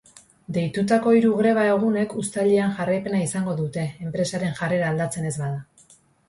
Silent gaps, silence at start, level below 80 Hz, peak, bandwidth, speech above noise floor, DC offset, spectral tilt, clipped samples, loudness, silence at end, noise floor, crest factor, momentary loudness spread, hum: none; 0.5 s; -60 dBFS; -8 dBFS; 11.5 kHz; 34 dB; under 0.1%; -6 dB/octave; under 0.1%; -23 LUFS; 0.65 s; -55 dBFS; 16 dB; 10 LU; none